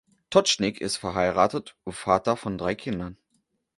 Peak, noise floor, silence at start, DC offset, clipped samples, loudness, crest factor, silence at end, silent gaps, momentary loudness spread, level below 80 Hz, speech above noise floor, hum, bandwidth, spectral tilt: -4 dBFS; -73 dBFS; 0.3 s; under 0.1%; under 0.1%; -25 LUFS; 22 dB; 0.65 s; none; 12 LU; -54 dBFS; 47 dB; none; 11.5 kHz; -4 dB/octave